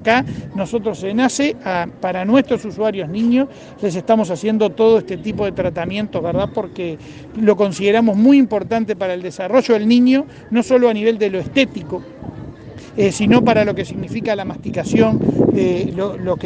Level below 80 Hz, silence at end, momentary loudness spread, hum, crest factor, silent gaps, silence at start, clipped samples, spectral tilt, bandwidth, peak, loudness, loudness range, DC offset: -48 dBFS; 0 s; 12 LU; none; 16 dB; none; 0 s; under 0.1%; -6 dB/octave; 9.6 kHz; 0 dBFS; -17 LUFS; 4 LU; under 0.1%